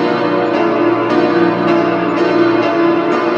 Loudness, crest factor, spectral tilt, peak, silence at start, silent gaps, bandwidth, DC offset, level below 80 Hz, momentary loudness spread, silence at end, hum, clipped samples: -13 LUFS; 12 dB; -7 dB/octave; 0 dBFS; 0 s; none; 7.2 kHz; under 0.1%; -60 dBFS; 2 LU; 0 s; 60 Hz at -40 dBFS; under 0.1%